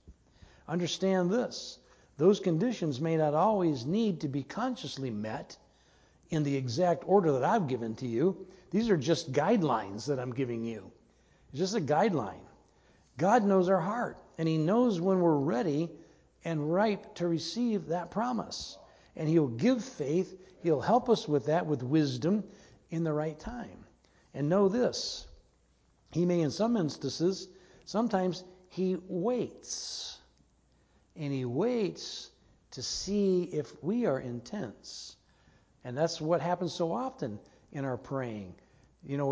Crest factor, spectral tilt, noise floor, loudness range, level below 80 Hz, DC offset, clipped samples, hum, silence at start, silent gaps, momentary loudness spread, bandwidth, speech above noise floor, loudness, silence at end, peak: 20 dB; -6 dB/octave; -68 dBFS; 5 LU; -64 dBFS; under 0.1%; under 0.1%; none; 0.05 s; none; 15 LU; 8 kHz; 38 dB; -31 LUFS; 0 s; -12 dBFS